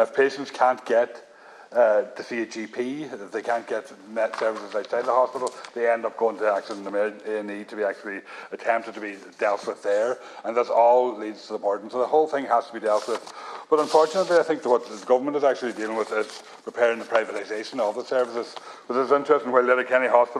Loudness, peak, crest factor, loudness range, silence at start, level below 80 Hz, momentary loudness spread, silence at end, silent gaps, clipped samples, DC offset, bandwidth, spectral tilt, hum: -24 LUFS; -4 dBFS; 20 dB; 5 LU; 0 s; -84 dBFS; 13 LU; 0 s; none; under 0.1%; under 0.1%; 11.5 kHz; -4 dB/octave; none